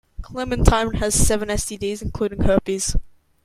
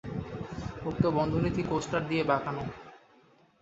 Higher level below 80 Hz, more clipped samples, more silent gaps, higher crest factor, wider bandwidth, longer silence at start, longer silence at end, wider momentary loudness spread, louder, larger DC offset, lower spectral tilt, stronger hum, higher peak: first, -26 dBFS vs -50 dBFS; neither; neither; about the same, 20 dB vs 20 dB; first, 16 kHz vs 8 kHz; first, 0.2 s vs 0.05 s; second, 0.35 s vs 0.65 s; about the same, 9 LU vs 11 LU; first, -21 LUFS vs -31 LUFS; neither; second, -4.5 dB/octave vs -7 dB/octave; neither; first, 0 dBFS vs -12 dBFS